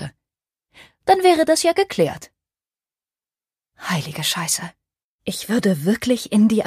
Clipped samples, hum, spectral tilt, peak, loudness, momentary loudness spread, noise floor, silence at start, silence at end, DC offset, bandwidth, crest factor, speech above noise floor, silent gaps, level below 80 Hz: under 0.1%; none; -4.5 dB/octave; -2 dBFS; -19 LUFS; 17 LU; under -90 dBFS; 0 s; 0 s; under 0.1%; 15.5 kHz; 20 dB; over 72 dB; 5.04-5.19 s; -58 dBFS